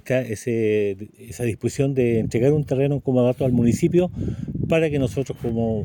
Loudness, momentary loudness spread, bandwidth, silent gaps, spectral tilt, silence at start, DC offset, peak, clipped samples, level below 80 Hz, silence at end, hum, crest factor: -22 LUFS; 8 LU; 17 kHz; none; -7.5 dB/octave; 0.05 s; under 0.1%; -6 dBFS; under 0.1%; -44 dBFS; 0 s; none; 14 dB